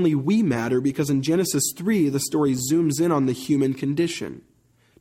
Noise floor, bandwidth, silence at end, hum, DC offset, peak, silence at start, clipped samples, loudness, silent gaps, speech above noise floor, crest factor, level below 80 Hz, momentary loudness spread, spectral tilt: -59 dBFS; 16 kHz; 0.6 s; none; under 0.1%; -10 dBFS; 0 s; under 0.1%; -22 LUFS; none; 38 dB; 12 dB; -60 dBFS; 3 LU; -5.5 dB/octave